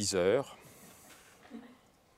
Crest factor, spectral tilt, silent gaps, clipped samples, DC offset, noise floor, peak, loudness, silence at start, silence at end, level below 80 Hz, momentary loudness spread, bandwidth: 20 dB; -3.5 dB/octave; none; under 0.1%; under 0.1%; -62 dBFS; -16 dBFS; -31 LUFS; 0 s; 0.5 s; -74 dBFS; 26 LU; 16 kHz